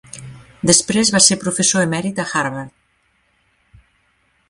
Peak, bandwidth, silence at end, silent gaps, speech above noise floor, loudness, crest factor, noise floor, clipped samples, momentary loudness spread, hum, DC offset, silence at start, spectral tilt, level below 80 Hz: 0 dBFS; 12.5 kHz; 1.8 s; none; 46 dB; -15 LUFS; 20 dB; -62 dBFS; under 0.1%; 22 LU; none; under 0.1%; 0.15 s; -2.5 dB/octave; -52 dBFS